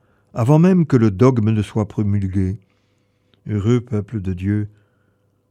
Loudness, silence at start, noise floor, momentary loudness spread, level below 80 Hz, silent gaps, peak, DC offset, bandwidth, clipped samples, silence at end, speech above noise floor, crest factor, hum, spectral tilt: -18 LUFS; 0.35 s; -62 dBFS; 12 LU; -50 dBFS; none; -2 dBFS; under 0.1%; 9.6 kHz; under 0.1%; 0.85 s; 46 dB; 16 dB; none; -9 dB/octave